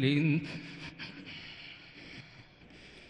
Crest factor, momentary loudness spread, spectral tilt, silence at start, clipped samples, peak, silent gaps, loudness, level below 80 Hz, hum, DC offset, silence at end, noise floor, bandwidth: 20 dB; 24 LU; -7 dB/octave; 0 s; under 0.1%; -16 dBFS; none; -36 LUFS; -66 dBFS; none; under 0.1%; 0 s; -55 dBFS; 9.4 kHz